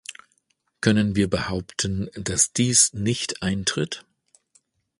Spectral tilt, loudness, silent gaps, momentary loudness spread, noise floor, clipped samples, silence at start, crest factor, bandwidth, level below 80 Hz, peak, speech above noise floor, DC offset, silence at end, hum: -3.5 dB/octave; -22 LUFS; none; 11 LU; -70 dBFS; under 0.1%; 0.1 s; 22 dB; 11.5 kHz; -46 dBFS; -4 dBFS; 47 dB; under 0.1%; 1 s; none